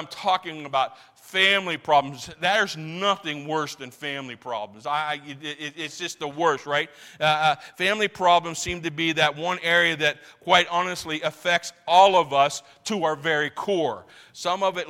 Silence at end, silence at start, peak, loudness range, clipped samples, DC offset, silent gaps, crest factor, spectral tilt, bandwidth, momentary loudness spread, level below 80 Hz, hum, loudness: 0 s; 0 s; -4 dBFS; 7 LU; under 0.1%; under 0.1%; none; 20 dB; -3 dB/octave; 16.5 kHz; 13 LU; -62 dBFS; none; -23 LUFS